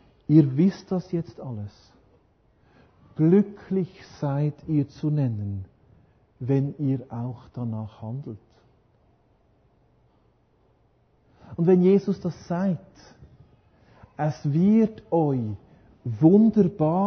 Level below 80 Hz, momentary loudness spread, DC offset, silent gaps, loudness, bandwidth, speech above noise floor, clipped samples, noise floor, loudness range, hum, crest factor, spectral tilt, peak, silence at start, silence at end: -58 dBFS; 18 LU; under 0.1%; none; -24 LUFS; 6.4 kHz; 40 dB; under 0.1%; -63 dBFS; 10 LU; none; 20 dB; -10 dB/octave; -6 dBFS; 0.3 s; 0 s